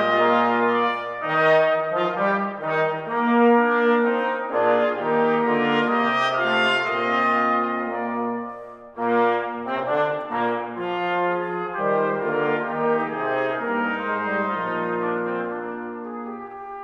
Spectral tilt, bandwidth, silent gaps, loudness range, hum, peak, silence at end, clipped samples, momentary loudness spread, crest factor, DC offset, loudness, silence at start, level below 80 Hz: -6 dB/octave; 8.2 kHz; none; 5 LU; none; -8 dBFS; 0 s; under 0.1%; 10 LU; 14 dB; under 0.1%; -22 LUFS; 0 s; -68 dBFS